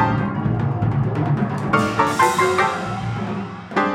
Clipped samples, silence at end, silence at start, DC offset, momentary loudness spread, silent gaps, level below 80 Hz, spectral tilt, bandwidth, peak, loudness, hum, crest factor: under 0.1%; 0 s; 0 s; under 0.1%; 9 LU; none; -44 dBFS; -6 dB/octave; 16.5 kHz; -2 dBFS; -20 LUFS; none; 18 dB